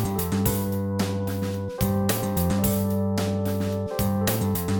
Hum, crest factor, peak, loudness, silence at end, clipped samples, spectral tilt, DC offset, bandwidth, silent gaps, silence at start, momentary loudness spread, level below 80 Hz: none; 16 dB; -10 dBFS; -25 LUFS; 0 s; under 0.1%; -6 dB/octave; under 0.1%; 17.5 kHz; none; 0 s; 4 LU; -42 dBFS